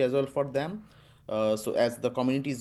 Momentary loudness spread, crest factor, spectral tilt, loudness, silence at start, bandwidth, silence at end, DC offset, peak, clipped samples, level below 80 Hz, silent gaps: 10 LU; 16 dB; -6 dB/octave; -29 LUFS; 0 s; 12.5 kHz; 0 s; under 0.1%; -14 dBFS; under 0.1%; -64 dBFS; none